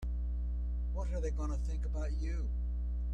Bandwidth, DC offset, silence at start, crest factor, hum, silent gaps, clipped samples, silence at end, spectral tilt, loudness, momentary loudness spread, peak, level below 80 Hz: 7.4 kHz; under 0.1%; 0 s; 8 dB; 60 Hz at -35 dBFS; none; under 0.1%; 0 s; -7.5 dB/octave; -38 LUFS; 2 LU; -26 dBFS; -34 dBFS